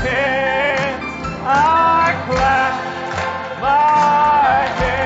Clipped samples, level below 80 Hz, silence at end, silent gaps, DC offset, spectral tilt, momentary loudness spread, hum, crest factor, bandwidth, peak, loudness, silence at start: under 0.1%; -36 dBFS; 0 s; none; under 0.1%; -5 dB/octave; 10 LU; none; 12 dB; 8 kHz; -4 dBFS; -16 LUFS; 0 s